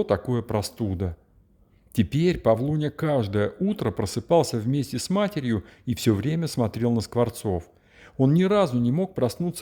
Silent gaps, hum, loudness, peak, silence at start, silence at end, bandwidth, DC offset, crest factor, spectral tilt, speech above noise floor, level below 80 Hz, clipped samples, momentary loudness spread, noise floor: none; none; -25 LUFS; -8 dBFS; 0 s; 0 s; 20 kHz; under 0.1%; 18 dB; -6.5 dB/octave; 35 dB; -52 dBFS; under 0.1%; 8 LU; -59 dBFS